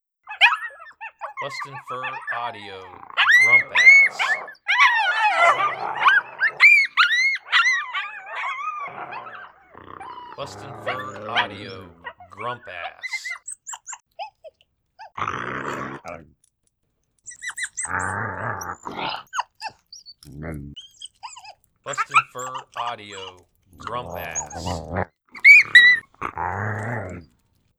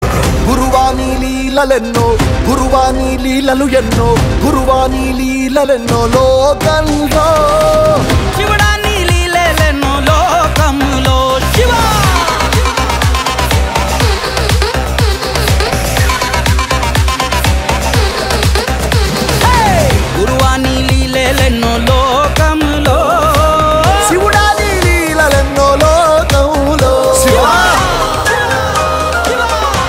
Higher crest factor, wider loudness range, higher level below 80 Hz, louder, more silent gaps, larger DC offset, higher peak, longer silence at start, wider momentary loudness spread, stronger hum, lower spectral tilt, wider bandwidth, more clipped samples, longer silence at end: first, 22 dB vs 10 dB; first, 18 LU vs 3 LU; second, -56 dBFS vs -18 dBFS; second, -18 LUFS vs -10 LUFS; neither; neither; about the same, 0 dBFS vs 0 dBFS; first, 0.25 s vs 0 s; first, 26 LU vs 4 LU; neither; second, -1.5 dB/octave vs -4.5 dB/octave; about the same, 15.5 kHz vs 16.5 kHz; neither; first, 0.55 s vs 0 s